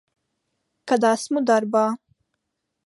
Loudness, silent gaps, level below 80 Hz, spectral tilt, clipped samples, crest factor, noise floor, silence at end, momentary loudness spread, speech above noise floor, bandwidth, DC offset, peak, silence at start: -21 LUFS; none; -78 dBFS; -4.5 dB/octave; under 0.1%; 18 dB; -78 dBFS; 0.9 s; 12 LU; 58 dB; 11.5 kHz; under 0.1%; -6 dBFS; 0.85 s